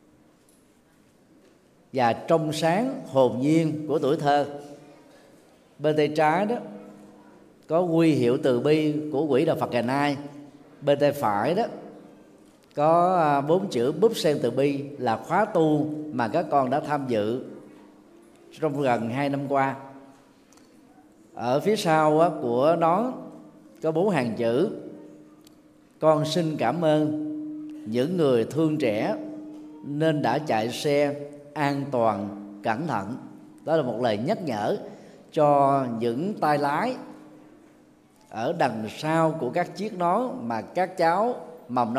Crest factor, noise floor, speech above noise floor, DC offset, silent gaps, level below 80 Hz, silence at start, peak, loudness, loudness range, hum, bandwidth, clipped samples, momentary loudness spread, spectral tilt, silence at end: 20 dB; -59 dBFS; 36 dB; under 0.1%; none; -72 dBFS; 1.95 s; -6 dBFS; -24 LUFS; 4 LU; none; 15 kHz; under 0.1%; 15 LU; -6.5 dB/octave; 0 s